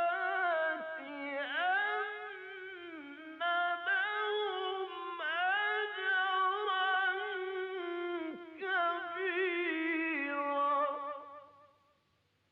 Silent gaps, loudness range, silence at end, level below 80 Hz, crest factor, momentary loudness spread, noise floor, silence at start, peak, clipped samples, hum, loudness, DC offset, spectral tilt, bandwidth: none; 3 LU; 1 s; under -90 dBFS; 12 dB; 13 LU; -75 dBFS; 0 s; -22 dBFS; under 0.1%; none; -34 LUFS; under 0.1%; -4 dB/octave; 5.8 kHz